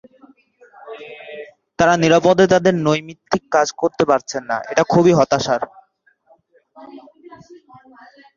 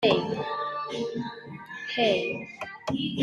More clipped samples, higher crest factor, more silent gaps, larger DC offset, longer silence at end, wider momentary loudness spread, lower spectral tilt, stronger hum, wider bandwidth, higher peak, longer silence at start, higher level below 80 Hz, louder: neither; about the same, 18 dB vs 20 dB; neither; neither; first, 0.85 s vs 0 s; first, 22 LU vs 13 LU; about the same, -5.5 dB/octave vs -5.5 dB/octave; neither; second, 7.4 kHz vs 11.5 kHz; first, 0 dBFS vs -8 dBFS; first, 0.85 s vs 0 s; first, -54 dBFS vs -66 dBFS; first, -16 LUFS vs -29 LUFS